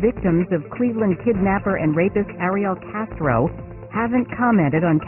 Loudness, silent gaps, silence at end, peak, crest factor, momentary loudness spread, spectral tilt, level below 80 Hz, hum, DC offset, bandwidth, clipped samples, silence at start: -20 LUFS; none; 0 s; -6 dBFS; 14 dB; 7 LU; -12.5 dB/octave; -40 dBFS; none; under 0.1%; 3.1 kHz; under 0.1%; 0 s